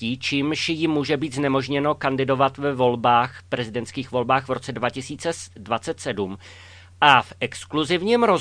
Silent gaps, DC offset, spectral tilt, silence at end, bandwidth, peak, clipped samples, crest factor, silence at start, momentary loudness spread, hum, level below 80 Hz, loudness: none; under 0.1%; -5 dB/octave; 0 s; 10.5 kHz; 0 dBFS; under 0.1%; 22 dB; 0 s; 10 LU; none; -58 dBFS; -22 LUFS